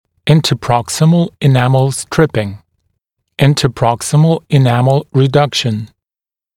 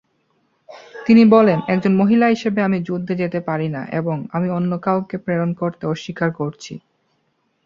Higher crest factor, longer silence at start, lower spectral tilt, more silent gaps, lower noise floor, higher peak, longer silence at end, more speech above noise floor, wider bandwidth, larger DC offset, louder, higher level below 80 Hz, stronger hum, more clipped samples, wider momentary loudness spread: about the same, 12 dB vs 16 dB; second, 0.25 s vs 0.7 s; second, -6 dB/octave vs -8 dB/octave; neither; first, under -90 dBFS vs -67 dBFS; about the same, 0 dBFS vs -2 dBFS; second, 0.7 s vs 0.9 s; first, over 78 dB vs 49 dB; first, 14.5 kHz vs 7.2 kHz; neither; first, -13 LUFS vs -18 LUFS; first, -44 dBFS vs -60 dBFS; neither; neither; second, 7 LU vs 14 LU